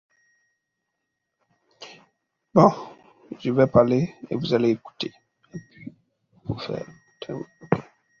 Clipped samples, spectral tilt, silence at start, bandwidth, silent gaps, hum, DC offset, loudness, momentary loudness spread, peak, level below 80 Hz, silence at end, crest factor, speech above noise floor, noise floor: under 0.1%; -7.5 dB/octave; 1.8 s; 7.2 kHz; none; none; under 0.1%; -23 LUFS; 26 LU; -2 dBFS; -56 dBFS; 0.4 s; 24 dB; 59 dB; -80 dBFS